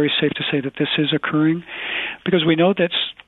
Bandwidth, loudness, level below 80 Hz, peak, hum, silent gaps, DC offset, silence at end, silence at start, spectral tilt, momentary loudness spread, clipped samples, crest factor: 4.2 kHz; -19 LUFS; -58 dBFS; -4 dBFS; none; none; under 0.1%; 0.15 s; 0 s; -9 dB/octave; 7 LU; under 0.1%; 16 dB